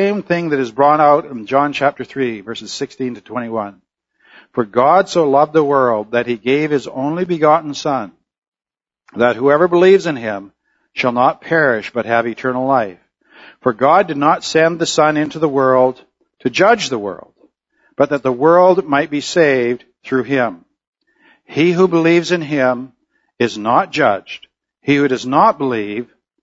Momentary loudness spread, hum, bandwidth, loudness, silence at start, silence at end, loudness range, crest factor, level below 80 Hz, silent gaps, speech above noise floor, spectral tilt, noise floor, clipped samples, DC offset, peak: 13 LU; none; 8 kHz; -15 LUFS; 0 s; 0.4 s; 3 LU; 16 dB; -60 dBFS; 8.38-8.42 s, 8.48-8.52 s, 20.87-20.93 s; over 75 dB; -5.5 dB/octave; under -90 dBFS; under 0.1%; under 0.1%; 0 dBFS